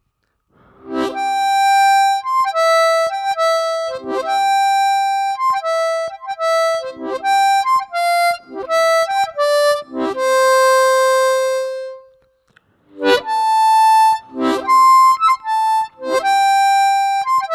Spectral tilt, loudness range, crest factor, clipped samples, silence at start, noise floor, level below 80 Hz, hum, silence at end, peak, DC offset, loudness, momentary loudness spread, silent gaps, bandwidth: -1 dB/octave; 4 LU; 16 dB; under 0.1%; 0.85 s; -68 dBFS; -64 dBFS; none; 0 s; 0 dBFS; under 0.1%; -15 LUFS; 10 LU; none; 16.5 kHz